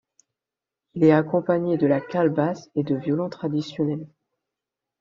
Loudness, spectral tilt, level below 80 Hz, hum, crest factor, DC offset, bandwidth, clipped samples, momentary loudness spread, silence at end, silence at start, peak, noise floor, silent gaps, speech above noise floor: -23 LUFS; -7.5 dB/octave; -66 dBFS; none; 20 dB; under 0.1%; 7.2 kHz; under 0.1%; 9 LU; 0.95 s; 0.95 s; -4 dBFS; -88 dBFS; none; 66 dB